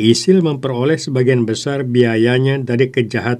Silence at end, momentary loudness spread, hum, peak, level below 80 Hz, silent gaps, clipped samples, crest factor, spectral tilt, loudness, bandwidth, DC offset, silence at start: 0 s; 5 LU; none; 0 dBFS; -58 dBFS; none; under 0.1%; 14 dB; -6 dB/octave; -15 LUFS; 11 kHz; under 0.1%; 0 s